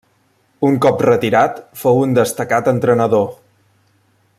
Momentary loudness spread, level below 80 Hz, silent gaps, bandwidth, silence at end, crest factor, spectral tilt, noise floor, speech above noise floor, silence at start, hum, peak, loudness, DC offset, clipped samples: 6 LU; -56 dBFS; none; 15.5 kHz; 1.05 s; 14 dB; -6.5 dB/octave; -59 dBFS; 45 dB; 0.6 s; none; -2 dBFS; -15 LUFS; under 0.1%; under 0.1%